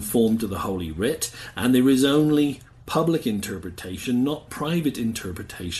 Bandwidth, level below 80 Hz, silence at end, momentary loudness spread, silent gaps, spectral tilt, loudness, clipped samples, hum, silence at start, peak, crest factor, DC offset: 12.5 kHz; -48 dBFS; 0 s; 14 LU; none; -5 dB/octave; -23 LUFS; under 0.1%; none; 0 s; -6 dBFS; 16 dB; under 0.1%